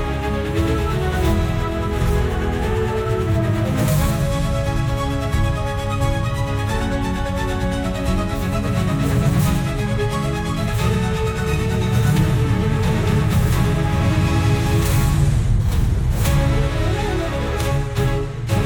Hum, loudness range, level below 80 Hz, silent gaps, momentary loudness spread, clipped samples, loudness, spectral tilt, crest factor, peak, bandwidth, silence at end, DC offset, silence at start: none; 3 LU; -24 dBFS; none; 4 LU; under 0.1%; -20 LUFS; -6.5 dB/octave; 14 dB; -4 dBFS; 19.5 kHz; 0 s; under 0.1%; 0 s